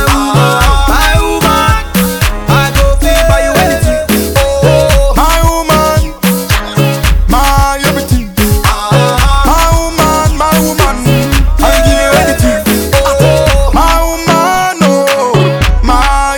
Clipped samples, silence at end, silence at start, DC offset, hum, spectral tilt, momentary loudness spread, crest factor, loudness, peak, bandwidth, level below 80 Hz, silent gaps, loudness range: 0.2%; 0 s; 0 s; under 0.1%; none; -4.5 dB/octave; 3 LU; 8 dB; -9 LUFS; 0 dBFS; over 20 kHz; -14 dBFS; none; 1 LU